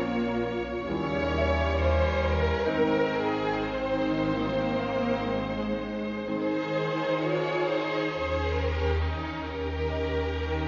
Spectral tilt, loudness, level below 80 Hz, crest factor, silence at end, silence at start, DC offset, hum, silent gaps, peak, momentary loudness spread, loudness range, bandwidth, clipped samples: -7.5 dB/octave; -28 LUFS; -36 dBFS; 14 dB; 0 s; 0 s; under 0.1%; none; none; -12 dBFS; 6 LU; 2 LU; 7.2 kHz; under 0.1%